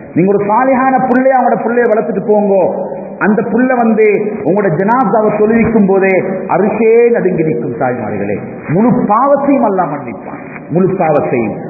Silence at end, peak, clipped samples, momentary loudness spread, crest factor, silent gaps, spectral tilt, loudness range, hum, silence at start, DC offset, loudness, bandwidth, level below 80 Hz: 0 s; 0 dBFS; under 0.1%; 8 LU; 10 dB; none; -12.5 dB/octave; 2 LU; none; 0 s; under 0.1%; -11 LUFS; 2.7 kHz; -46 dBFS